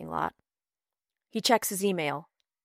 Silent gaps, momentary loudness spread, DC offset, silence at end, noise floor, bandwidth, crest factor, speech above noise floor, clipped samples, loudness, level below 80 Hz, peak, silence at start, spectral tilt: none; 12 LU; under 0.1%; 0.45 s; under -90 dBFS; 16 kHz; 22 dB; over 62 dB; under 0.1%; -29 LUFS; -68 dBFS; -10 dBFS; 0 s; -3 dB/octave